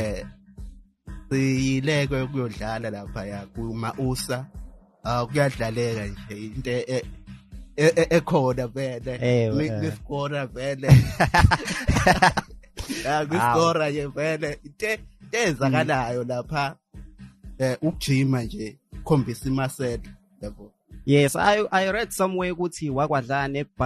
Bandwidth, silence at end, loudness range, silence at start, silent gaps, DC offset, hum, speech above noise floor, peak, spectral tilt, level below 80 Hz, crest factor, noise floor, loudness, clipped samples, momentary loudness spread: 13 kHz; 0 s; 7 LU; 0 s; none; under 0.1%; none; 20 dB; -2 dBFS; -6 dB/octave; -40 dBFS; 22 dB; -43 dBFS; -24 LUFS; under 0.1%; 16 LU